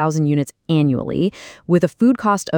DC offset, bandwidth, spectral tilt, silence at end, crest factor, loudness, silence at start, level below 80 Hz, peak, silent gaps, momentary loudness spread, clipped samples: under 0.1%; 18.5 kHz; -7 dB/octave; 0 s; 14 dB; -18 LUFS; 0 s; -52 dBFS; -4 dBFS; none; 6 LU; under 0.1%